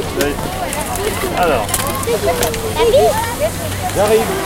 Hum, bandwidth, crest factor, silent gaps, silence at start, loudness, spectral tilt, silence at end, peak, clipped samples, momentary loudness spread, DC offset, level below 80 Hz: none; 17 kHz; 16 dB; none; 0 s; -16 LUFS; -4 dB/octave; 0 s; 0 dBFS; under 0.1%; 7 LU; under 0.1%; -30 dBFS